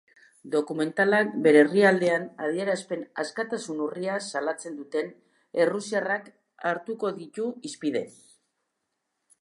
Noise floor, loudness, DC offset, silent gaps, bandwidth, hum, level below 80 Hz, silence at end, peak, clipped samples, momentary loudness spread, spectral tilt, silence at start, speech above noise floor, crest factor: -80 dBFS; -26 LUFS; under 0.1%; none; 11.5 kHz; none; -82 dBFS; 1.3 s; -6 dBFS; under 0.1%; 13 LU; -5 dB/octave; 0.45 s; 55 dB; 22 dB